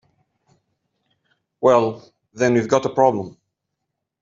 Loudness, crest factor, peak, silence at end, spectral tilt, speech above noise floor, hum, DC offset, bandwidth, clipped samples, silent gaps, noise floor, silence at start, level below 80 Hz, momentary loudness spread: -19 LUFS; 20 dB; -2 dBFS; 0.95 s; -6 dB/octave; 62 dB; none; under 0.1%; 7.6 kHz; under 0.1%; none; -79 dBFS; 1.6 s; -64 dBFS; 14 LU